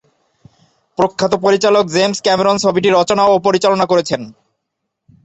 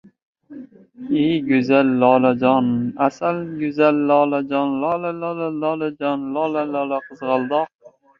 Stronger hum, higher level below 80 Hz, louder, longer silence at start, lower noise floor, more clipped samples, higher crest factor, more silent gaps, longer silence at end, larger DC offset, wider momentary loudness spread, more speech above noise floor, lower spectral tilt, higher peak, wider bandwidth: neither; first, -54 dBFS vs -64 dBFS; first, -14 LUFS vs -19 LUFS; first, 1 s vs 0.5 s; first, -75 dBFS vs -40 dBFS; neither; about the same, 14 dB vs 18 dB; second, none vs 7.75-7.79 s; first, 0.95 s vs 0.3 s; neither; about the same, 8 LU vs 10 LU; first, 62 dB vs 21 dB; second, -4.5 dB/octave vs -8 dB/octave; about the same, 0 dBFS vs -2 dBFS; first, 8.2 kHz vs 7 kHz